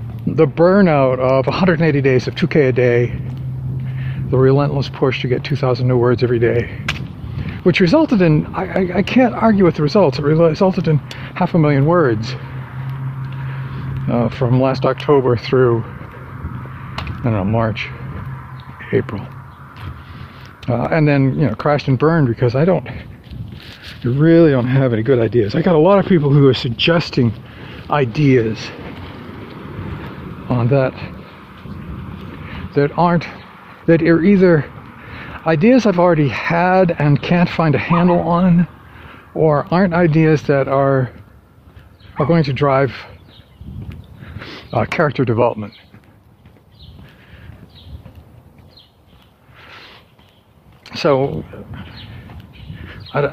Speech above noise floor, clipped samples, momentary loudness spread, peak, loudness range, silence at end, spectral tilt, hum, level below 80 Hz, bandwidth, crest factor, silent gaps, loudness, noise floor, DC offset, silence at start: 35 dB; under 0.1%; 20 LU; 0 dBFS; 9 LU; 0 s; -8.5 dB/octave; none; -42 dBFS; 7.2 kHz; 16 dB; none; -15 LUFS; -49 dBFS; under 0.1%; 0 s